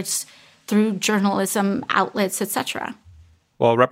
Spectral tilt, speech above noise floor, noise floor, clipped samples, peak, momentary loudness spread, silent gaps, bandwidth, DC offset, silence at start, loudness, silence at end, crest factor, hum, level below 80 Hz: -4 dB/octave; 30 dB; -51 dBFS; under 0.1%; -2 dBFS; 10 LU; none; 16 kHz; under 0.1%; 0 s; -21 LUFS; 0 s; 20 dB; none; -62 dBFS